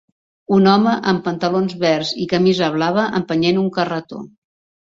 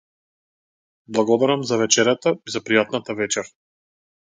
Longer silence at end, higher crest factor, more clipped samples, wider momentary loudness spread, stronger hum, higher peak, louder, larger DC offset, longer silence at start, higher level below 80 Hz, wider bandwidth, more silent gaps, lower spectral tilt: second, 0.55 s vs 0.85 s; second, 16 dB vs 22 dB; neither; about the same, 8 LU vs 9 LU; neither; about the same, -2 dBFS vs 0 dBFS; first, -17 LUFS vs -20 LUFS; neither; second, 0.5 s vs 1.1 s; first, -56 dBFS vs -68 dBFS; second, 7.6 kHz vs 9.8 kHz; neither; first, -6.5 dB/octave vs -3 dB/octave